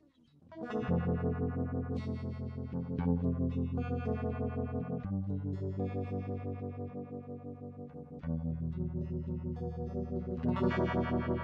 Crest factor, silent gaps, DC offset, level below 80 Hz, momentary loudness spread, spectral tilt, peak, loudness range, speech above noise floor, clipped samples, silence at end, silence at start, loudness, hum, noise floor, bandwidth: 16 dB; none; under 0.1%; -48 dBFS; 12 LU; -10 dB/octave; -18 dBFS; 5 LU; 28 dB; under 0.1%; 0 s; 0.45 s; -36 LUFS; none; -63 dBFS; 5.6 kHz